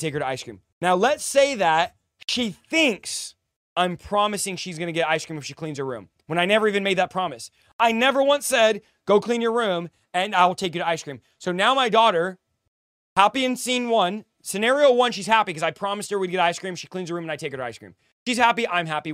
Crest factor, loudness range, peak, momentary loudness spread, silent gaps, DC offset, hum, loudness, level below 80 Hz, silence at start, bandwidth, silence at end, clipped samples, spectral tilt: 22 dB; 4 LU; 0 dBFS; 13 LU; 0.72-0.81 s, 3.56-3.76 s, 7.73-7.79 s, 12.68-13.16 s, 18.12-18.26 s; under 0.1%; none; -22 LUFS; -64 dBFS; 0 s; 16 kHz; 0 s; under 0.1%; -3.5 dB/octave